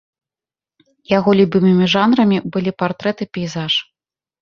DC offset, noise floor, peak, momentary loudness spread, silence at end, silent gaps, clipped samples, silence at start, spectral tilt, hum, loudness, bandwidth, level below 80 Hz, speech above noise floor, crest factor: under 0.1%; under -90 dBFS; -2 dBFS; 9 LU; 0.6 s; none; under 0.1%; 1.1 s; -6.5 dB/octave; none; -16 LUFS; 7 kHz; -56 dBFS; over 75 dB; 16 dB